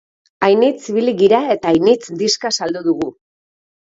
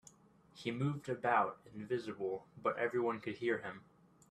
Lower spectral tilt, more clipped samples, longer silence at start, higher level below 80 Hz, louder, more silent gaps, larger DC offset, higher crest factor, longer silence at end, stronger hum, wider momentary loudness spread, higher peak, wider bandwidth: second, -4 dB/octave vs -7 dB/octave; neither; second, 0.4 s vs 0.55 s; first, -58 dBFS vs -76 dBFS; first, -16 LUFS vs -38 LUFS; neither; neither; second, 16 dB vs 22 dB; first, 0.85 s vs 0.5 s; neither; second, 6 LU vs 10 LU; first, 0 dBFS vs -18 dBFS; second, 7.8 kHz vs 11.5 kHz